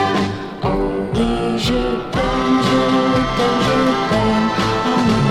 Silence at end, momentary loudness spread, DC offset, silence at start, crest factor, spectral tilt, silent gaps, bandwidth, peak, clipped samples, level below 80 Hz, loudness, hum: 0 s; 5 LU; under 0.1%; 0 s; 12 dB; -6 dB/octave; none; 14 kHz; -4 dBFS; under 0.1%; -32 dBFS; -17 LUFS; none